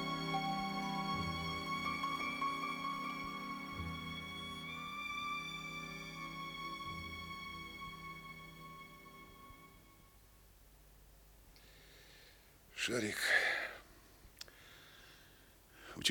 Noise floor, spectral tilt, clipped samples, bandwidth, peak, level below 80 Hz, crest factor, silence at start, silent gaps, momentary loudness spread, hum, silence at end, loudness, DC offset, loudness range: -63 dBFS; -3 dB/octave; under 0.1%; over 20 kHz; -18 dBFS; -64 dBFS; 24 dB; 0 s; none; 22 LU; none; 0 s; -40 LUFS; under 0.1%; 19 LU